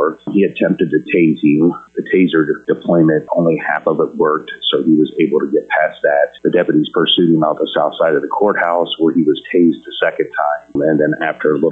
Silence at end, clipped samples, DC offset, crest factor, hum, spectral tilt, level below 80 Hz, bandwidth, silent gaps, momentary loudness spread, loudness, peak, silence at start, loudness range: 0 s; under 0.1%; under 0.1%; 12 dB; none; -8.5 dB/octave; -60 dBFS; 4 kHz; none; 5 LU; -15 LUFS; -2 dBFS; 0 s; 1 LU